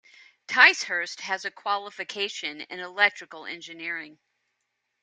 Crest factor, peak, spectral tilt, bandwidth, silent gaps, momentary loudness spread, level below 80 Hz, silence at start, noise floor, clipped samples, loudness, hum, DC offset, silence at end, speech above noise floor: 26 dB; -2 dBFS; -0.5 dB/octave; 9.4 kHz; none; 20 LU; -86 dBFS; 0.5 s; -79 dBFS; under 0.1%; -24 LUFS; none; under 0.1%; 0.9 s; 52 dB